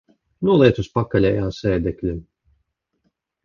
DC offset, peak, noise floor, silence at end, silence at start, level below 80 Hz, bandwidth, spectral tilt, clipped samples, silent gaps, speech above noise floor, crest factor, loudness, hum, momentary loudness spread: under 0.1%; -2 dBFS; -71 dBFS; 1.25 s; 0.4 s; -40 dBFS; 7.2 kHz; -8 dB/octave; under 0.1%; none; 53 dB; 20 dB; -19 LUFS; none; 12 LU